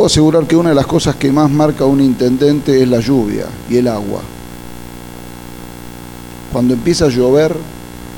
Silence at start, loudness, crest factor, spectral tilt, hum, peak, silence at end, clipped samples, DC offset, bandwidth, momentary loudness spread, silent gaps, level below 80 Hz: 0 s; -12 LUFS; 14 dB; -6 dB/octave; 60 Hz at -35 dBFS; 0 dBFS; 0 s; under 0.1%; under 0.1%; 19 kHz; 20 LU; none; -36 dBFS